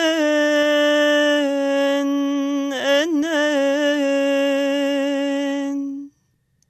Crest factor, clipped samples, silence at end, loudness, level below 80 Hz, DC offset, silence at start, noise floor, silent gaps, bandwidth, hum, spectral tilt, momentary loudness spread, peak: 14 dB; under 0.1%; 0.6 s; -19 LUFS; -74 dBFS; under 0.1%; 0 s; -65 dBFS; none; 13.5 kHz; none; -2 dB/octave; 7 LU; -6 dBFS